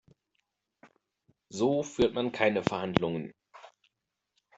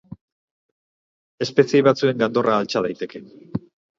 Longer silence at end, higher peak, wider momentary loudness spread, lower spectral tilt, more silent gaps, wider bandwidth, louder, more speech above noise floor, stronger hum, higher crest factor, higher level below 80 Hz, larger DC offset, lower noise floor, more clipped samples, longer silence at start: first, 0.9 s vs 0.4 s; second, -4 dBFS vs 0 dBFS; second, 11 LU vs 16 LU; about the same, -5.5 dB/octave vs -6 dB/octave; second, none vs 0.21-1.38 s; about the same, 8.2 kHz vs 7.6 kHz; second, -29 LUFS vs -19 LUFS; second, 55 dB vs over 70 dB; neither; first, 30 dB vs 22 dB; about the same, -60 dBFS vs -62 dBFS; neither; second, -84 dBFS vs under -90 dBFS; neither; first, 1.5 s vs 0.1 s